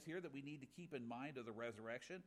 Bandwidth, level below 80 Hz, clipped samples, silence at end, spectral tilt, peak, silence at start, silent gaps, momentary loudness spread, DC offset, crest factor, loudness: 14.5 kHz; -86 dBFS; under 0.1%; 0 s; -5.5 dB/octave; -36 dBFS; 0 s; none; 4 LU; under 0.1%; 16 dB; -52 LUFS